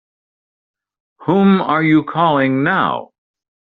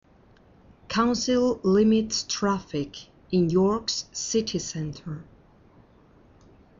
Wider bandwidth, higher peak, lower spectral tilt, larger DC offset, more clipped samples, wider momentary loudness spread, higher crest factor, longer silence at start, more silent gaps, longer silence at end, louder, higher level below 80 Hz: second, 4.6 kHz vs 7.6 kHz; first, -2 dBFS vs -10 dBFS; about the same, -5.5 dB/octave vs -5 dB/octave; neither; neither; second, 7 LU vs 14 LU; about the same, 14 dB vs 16 dB; first, 1.2 s vs 0.9 s; neither; second, 0.65 s vs 1.55 s; first, -15 LUFS vs -25 LUFS; about the same, -58 dBFS vs -54 dBFS